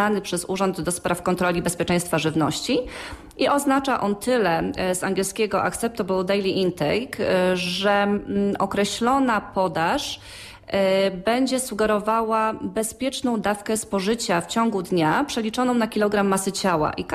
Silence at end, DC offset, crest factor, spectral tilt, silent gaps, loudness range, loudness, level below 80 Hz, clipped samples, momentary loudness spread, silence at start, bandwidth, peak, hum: 0 s; under 0.1%; 14 dB; -4.5 dB/octave; none; 1 LU; -22 LUFS; -50 dBFS; under 0.1%; 5 LU; 0 s; 15.5 kHz; -8 dBFS; none